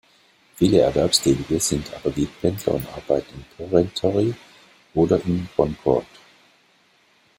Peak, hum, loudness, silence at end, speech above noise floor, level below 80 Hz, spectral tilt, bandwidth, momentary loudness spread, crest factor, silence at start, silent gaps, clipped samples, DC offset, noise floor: -2 dBFS; none; -21 LUFS; 1.35 s; 38 dB; -46 dBFS; -5 dB/octave; 16 kHz; 9 LU; 20 dB; 0.6 s; none; under 0.1%; under 0.1%; -59 dBFS